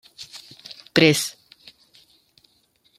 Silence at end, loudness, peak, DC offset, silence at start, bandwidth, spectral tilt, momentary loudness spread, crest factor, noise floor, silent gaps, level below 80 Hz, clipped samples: 1.7 s; -19 LUFS; -2 dBFS; under 0.1%; 0.2 s; 16 kHz; -4 dB/octave; 24 LU; 24 dB; -64 dBFS; none; -64 dBFS; under 0.1%